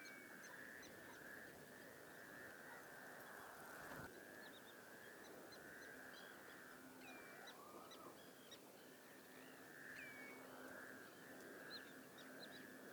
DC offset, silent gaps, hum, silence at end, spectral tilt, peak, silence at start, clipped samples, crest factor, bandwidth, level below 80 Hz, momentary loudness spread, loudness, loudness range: under 0.1%; none; none; 0 s; -3 dB/octave; -42 dBFS; 0 s; under 0.1%; 16 dB; over 20 kHz; -86 dBFS; 5 LU; -58 LUFS; 2 LU